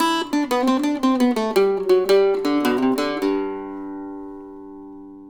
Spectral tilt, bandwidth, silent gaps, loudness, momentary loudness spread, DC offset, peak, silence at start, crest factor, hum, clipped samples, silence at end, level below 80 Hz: -4.5 dB/octave; over 20 kHz; none; -20 LUFS; 21 LU; under 0.1%; -6 dBFS; 0 s; 16 dB; none; under 0.1%; 0 s; -54 dBFS